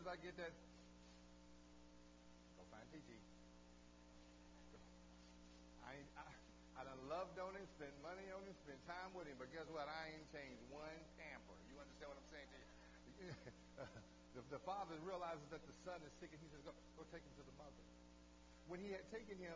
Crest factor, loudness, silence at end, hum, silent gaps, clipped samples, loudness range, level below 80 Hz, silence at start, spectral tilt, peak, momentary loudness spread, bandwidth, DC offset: 20 dB; -57 LUFS; 0 s; 60 Hz at -70 dBFS; none; under 0.1%; 11 LU; -72 dBFS; 0 s; -5 dB/octave; -36 dBFS; 16 LU; 8 kHz; under 0.1%